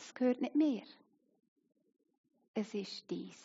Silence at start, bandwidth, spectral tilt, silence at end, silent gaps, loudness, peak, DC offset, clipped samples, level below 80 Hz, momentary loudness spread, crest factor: 0 s; 7.6 kHz; -5 dB/octave; 0.1 s; 1.48-1.56 s, 2.18-2.24 s, 2.48-2.54 s; -37 LUFS; -22 dBFS; under 0.1%; under 0.1%; under -90 dBFS; 11 LU; 18 dB